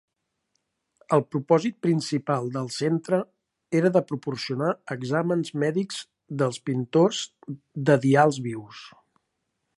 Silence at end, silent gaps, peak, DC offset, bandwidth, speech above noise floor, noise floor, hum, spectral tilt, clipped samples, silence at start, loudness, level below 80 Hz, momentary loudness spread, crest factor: 0.9 s; none; -6 dBFS; under 0.1%; 11.5 kHz; 54 dB; -78 dBFS; none; -6 dB/octave; under 0.1%; 1.1 s; -25 LUFS; -72 dBFS; 14 LU; 20 dB